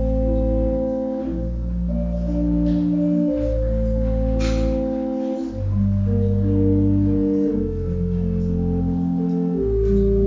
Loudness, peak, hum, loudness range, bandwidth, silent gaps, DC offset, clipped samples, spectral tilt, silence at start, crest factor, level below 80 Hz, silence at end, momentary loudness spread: -21 LUFS; -8 dBFS; none; 2 LU; 7.6 kHz; none; under 0.1%; under 0.1%; -10 dB/octave; 0 s; 12 dB; -26 dBFS; 0 s; 6 LU